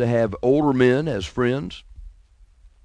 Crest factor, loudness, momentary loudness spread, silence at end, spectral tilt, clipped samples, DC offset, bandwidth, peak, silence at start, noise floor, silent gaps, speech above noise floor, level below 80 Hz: 18 dB; -21 LUFS; 13 LU; 0.75 s; -7.5 dB/octave; under 0.1%; under 0.1%; 10.5 kHz; -4 dBFS; 0 s; -52 dBFS; none; 32 dB; -44 dBFS